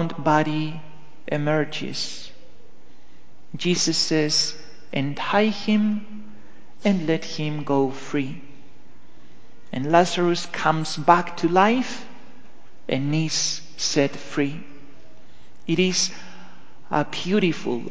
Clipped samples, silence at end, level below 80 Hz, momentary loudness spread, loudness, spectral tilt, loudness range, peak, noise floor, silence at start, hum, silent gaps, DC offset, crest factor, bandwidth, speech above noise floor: under 0.1%; 0 s; -60 dBFS; 18 LU; -23 LUFS; -4.5 dB/octave; 5 LU; 0 dBFS; -54 dBFS; 0 s; none; none; 3%; 24 dB; 8 kHz; 32 dB